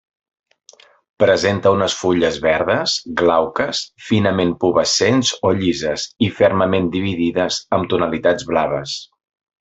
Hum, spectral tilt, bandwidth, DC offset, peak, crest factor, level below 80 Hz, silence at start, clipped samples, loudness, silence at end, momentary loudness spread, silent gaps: none; -4.5 dB/octave; 8.4 kHz; under 0.1%; -2 dBFS; 16 dB; -52 dBFS; 1.2 s; under 0.1%; -17 LUFS; 0.55 s; 6 LU; none